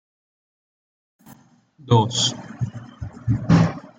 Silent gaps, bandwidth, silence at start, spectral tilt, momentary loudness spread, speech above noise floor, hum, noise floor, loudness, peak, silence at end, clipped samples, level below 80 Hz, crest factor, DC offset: none; 9.4 kHz; 1.85 s; -5.5 dB/octave; 14 LU; 33 dB; none; -51 dBFS; -21 LUFS; -4 dBFS; 0.1 s; under 0.1%; -48 dBFS; 20 dB; under 0.1%